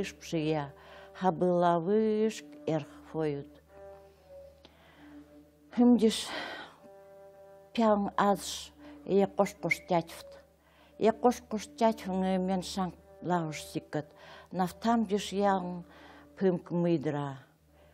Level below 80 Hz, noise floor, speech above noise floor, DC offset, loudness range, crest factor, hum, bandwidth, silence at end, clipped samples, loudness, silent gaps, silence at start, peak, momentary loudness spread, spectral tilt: -64 dBFS; -61 dBFS; 32 dB; under 0.1%; 3 LU; 20 dB; none; 16 kHz; 0.5 s; under 0.1%; -31 LUFS; none; 0 s; -12 dBFS; 19 LU; -6 dB/octave